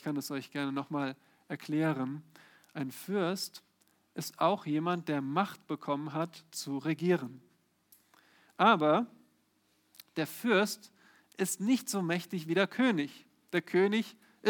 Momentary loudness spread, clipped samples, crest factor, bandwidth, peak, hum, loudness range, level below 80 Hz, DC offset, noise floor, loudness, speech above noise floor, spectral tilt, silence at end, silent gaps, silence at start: 14 LU; under 0.1%; 22 dB; 19.5 kHz; -10 dBFS; none; 5 LU; -88 dBFS; under 0.1%; -73 dBFS; -32 LUFS; 41 dB; -5 dB/octave; 0 s; none; 0.05 s